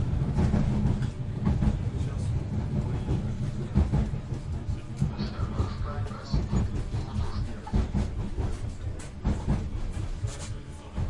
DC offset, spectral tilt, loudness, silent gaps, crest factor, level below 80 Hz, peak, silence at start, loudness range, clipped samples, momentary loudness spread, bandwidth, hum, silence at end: under 0.1%; -7.5 dB/octave; -31 LUFS; none; 18 dB; -34 dBFS; -10 dBFS; 0 s; 4 LU; under 0.1%; 9 LU; 11 kHz; none; 0 s